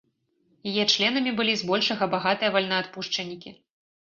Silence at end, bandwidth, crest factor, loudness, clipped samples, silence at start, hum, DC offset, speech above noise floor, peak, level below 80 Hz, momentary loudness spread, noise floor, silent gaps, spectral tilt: 0.55 s; 7.6 kHz; 20 dB; -24 LUFS; under 0.1%; 0.65 s; none; under 0.1%; 44 dB; -6 dBFS; -70 dBFS; 9 LU; -69 dBFS; none; -3.5 dB/octave